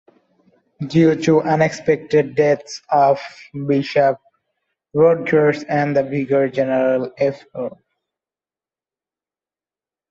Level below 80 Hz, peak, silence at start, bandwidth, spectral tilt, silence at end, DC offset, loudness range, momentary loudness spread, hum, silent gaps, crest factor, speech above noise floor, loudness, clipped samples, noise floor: -60 dBFS; -4 dBFS; 0.8 s; 7.8 kHz; -7 dB/octave; 2.35 s; under 0.1%; 6 LU; 13 LU; 50 Hz at -45 dBFS; none; 16 dB; over 73 dB; -17 LUFS; under 0.1%; under -90 dBFS